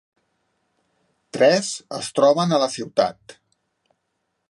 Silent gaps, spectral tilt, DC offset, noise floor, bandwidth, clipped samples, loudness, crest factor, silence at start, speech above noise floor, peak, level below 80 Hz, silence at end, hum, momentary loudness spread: none; -4.5 dB/octave; under 0.1%; -75 dBFS; 11.5 kHz; under 0.1%; -20 LUFS; 18 dB; 1.35 s; 55 dB; -4 dBFS; -70 dBFS; 1.2 s; none; 11 LU